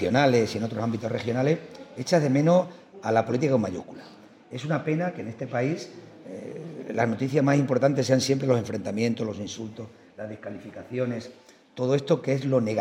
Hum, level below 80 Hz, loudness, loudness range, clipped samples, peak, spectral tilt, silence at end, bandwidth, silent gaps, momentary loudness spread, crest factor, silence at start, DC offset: none; -70 dBFS; -26 LUFS; 6 LU; under 0.1%; -6 dBFS; -6.5 dB/octave; 0 s; 15 kHz; none; 18 LU; 18 dB; 0 s; under 0.1%